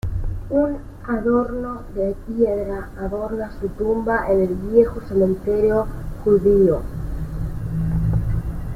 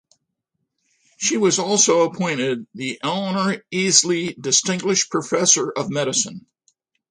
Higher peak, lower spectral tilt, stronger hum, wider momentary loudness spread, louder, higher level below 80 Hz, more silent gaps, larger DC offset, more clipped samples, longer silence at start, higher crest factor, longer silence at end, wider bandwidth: about the same, -2 dBFS vs 0 dBFS; first, -9.5 dB/octave vs -2.5 dB/octave; neither; about the same, 11 LU vs 9 LU; about the same, -21 LUFS vs -19 LUFS; first, -30 dBFS vs -66 dBFS; neither; neither; neither; second, 0.05 s vs 1.2 s; about the same, 18 dB vs 22 dB; second, 0 s vs 0.7 s; first, 15 kHz vs 11 kHz